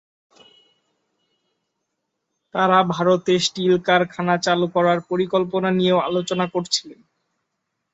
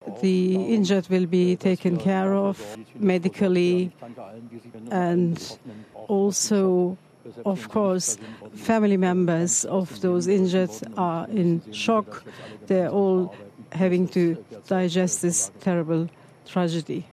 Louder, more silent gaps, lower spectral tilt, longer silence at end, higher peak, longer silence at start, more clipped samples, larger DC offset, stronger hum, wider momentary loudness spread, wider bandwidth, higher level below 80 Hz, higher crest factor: first, -20 LUFS vs -23 LUFS; neither; about the same, -5 dB/octave vs -5.5 dB/octave; first, 1 s vs 0.1 s; first, -2 dBFS vs -8 dBFS; first, 2.55 s vs 0.05 s; neither; neither; neither; second, 6 LU vs 16 LU; second, 8.2 kHz vs 14 kHz; first, -64 dBFS vs -70 dBFS; about the same, 18 dB vs 16 dB